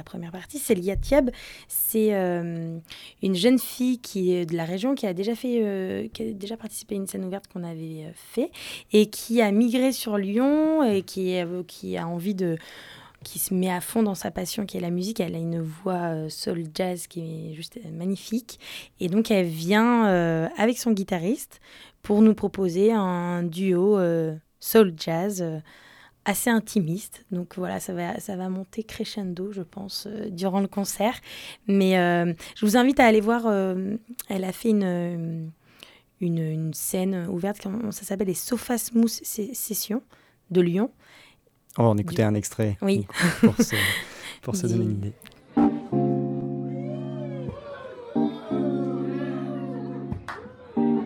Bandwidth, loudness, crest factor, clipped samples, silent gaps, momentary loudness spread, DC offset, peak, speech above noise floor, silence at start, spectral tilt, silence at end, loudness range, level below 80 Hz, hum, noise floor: 18.5 kHz; -25 LUFS; 22 dB; under 0.1%; none; 14 LU; under 0.1%; -4 dBFS; 32 dB; 0 s; -5.5 dB/octave; 0 s; 7 LU; -52 dBFS; none; -57 dBFS